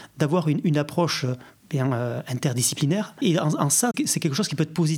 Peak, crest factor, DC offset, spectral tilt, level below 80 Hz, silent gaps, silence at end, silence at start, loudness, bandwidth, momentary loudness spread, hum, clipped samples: -6 dBFS; 16 dB; under 0.1%; -4.5 dB/octave; -70 dBFS; none; 0 s; 0 s; -23 LUFS; 17 kHz; 7 LU; none; under 0.1%